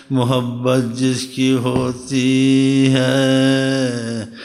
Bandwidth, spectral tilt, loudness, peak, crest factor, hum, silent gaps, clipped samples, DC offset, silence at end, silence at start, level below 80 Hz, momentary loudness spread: 13.5 kHz; -5.5 dB/octave; -16 LUFS; -4 dBFS; 14 dB; none; none; under 0.1%; under 0.1%; 0 s; 0.1 s; -54 dBFS; 7 LU